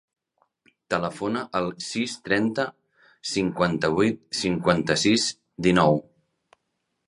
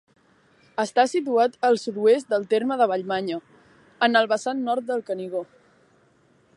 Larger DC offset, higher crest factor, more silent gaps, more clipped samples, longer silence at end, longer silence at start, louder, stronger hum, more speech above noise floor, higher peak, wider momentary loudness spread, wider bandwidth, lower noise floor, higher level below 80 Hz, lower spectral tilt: neither; about the same, 22 dB vs 20 dB; neither; neither; about the same, 1.05 s vs 1.15 s; about the same, 0.9 s vs 0.8 s; about the same, -24 LUFS vs -23 LUFS; neither; first, 54 dB vs 38 dB; about the same, -2 dBFS vs -4 dBFS; about the same, 9 LU vs 11 LU; about the same, 11.5 kHz vs 11.5 kHz; first, -78 dBFS vs -60 dBFS; first, -54 dBFS vs -76 dBFS; about the same, -4.5 dB/octave vs -4 dB/octave